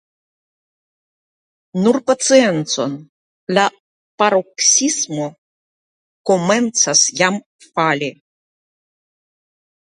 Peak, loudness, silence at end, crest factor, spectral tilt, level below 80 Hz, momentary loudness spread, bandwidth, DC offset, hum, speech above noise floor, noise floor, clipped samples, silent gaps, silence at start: 0 dBFS; -15 LUFS; 1.85 s; 20 dB; -2.5 dB/octave; -68 dBFS; 14 LU; 11 kHz; under 0.1%; none; over 74 dB; under -90 dBFS; under 0.1%; 3.09-3.47 s, 3.80-4.18 s, 5.38-6.24 s, 7.46-7.59 s; 1.75 s